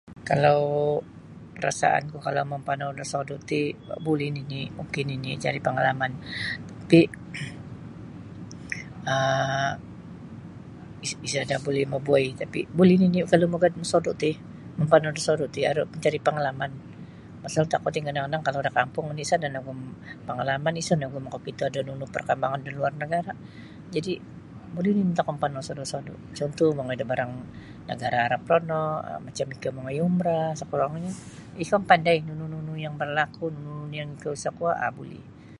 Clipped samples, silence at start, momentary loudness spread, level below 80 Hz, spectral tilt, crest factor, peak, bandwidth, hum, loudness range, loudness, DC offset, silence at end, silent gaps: under 0.1%; 0.05 s; 20 LU; -58 dBFS; -5.5 dB/octave; 24 dB; -2 dBFS; 11.5 kHz; none; 6 LU; -26 LUFS; under 0.1%; 0.05 s; none